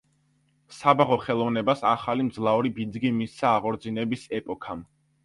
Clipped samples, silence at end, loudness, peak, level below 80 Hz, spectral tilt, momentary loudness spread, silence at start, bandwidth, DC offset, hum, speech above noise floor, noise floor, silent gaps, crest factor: under 0.1%; 0.4 s; -25 LUFS; -4 dBFS; -62 dBFS; -6.5 dB/octave; 11 LU; 0.7 s; 11.5 kHz; under 0.1%; none; 42 dB; -67 dBFS; none; 22 dB